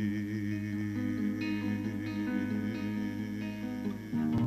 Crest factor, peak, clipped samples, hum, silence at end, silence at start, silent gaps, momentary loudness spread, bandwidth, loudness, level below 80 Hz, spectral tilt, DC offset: 12 dB; -20 dBFS; under 0.1%; none; 0 s; 0 s; none; 4 LU; 14 kHz; -35 LUFS; -60 dBFS; -7.5 dB/octave; under 0.1%